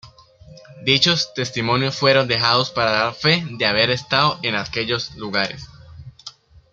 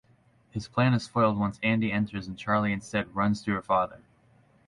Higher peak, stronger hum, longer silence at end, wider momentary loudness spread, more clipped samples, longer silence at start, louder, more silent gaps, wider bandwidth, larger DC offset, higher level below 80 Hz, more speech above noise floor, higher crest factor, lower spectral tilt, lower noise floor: first, -2 dBFS vs -12 dBFS; neither; second, 0.4 s vs 0.7 s; about the same, 10 LU vs 8 LU; neither; second, 0.05 s vs 0.55 s; first, -18 LUFS vs -27 LUFS; neither; about the same, 12 kHz vs 11 kHz; neither; about the same, -52 dBFS vs -56 dBFS; second, 26 dB vs 35 dB; about the same, 20 dB vs 16 dB; second, -4 dB/octave vs -7 dB/octave; second, -46 dBFS vs -63 dBFS